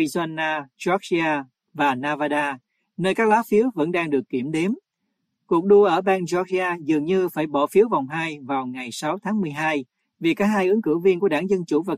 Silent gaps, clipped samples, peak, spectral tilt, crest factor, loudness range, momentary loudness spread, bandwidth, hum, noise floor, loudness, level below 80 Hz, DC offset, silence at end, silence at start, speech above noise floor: none; under 0.1%; -6 dBFS; -6 dB/octave; 16 dB; 3 LU; 9 LU; 15 kHz; none; -76 dBFS; -22 LUFS; -66 dBFS; under 0.1%; 0 s; 0 s; 55 dB